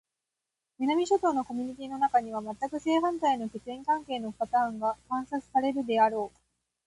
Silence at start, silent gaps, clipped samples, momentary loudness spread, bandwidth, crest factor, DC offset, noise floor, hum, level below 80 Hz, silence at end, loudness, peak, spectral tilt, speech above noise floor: 0.8 s; none; under 0.1%; 10 LU; 11.5 kHz; 18 dB; under 0.1%; -87 dBFS; none; -66 dBFS; 0.6 s; -29 LUFS; -12 dBFS; -4.5 dB/octave; 59 dB